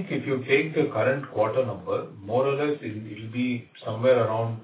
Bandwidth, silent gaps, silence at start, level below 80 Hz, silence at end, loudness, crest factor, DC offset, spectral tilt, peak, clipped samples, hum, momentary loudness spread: 4 kHz; none; 0 s; -64 dBFS; 0 s; -26 LUFS; 16 dB; under 0.1%; -10.5 dB/octave; -8 dBFS; under 0.1%; none; 11 LU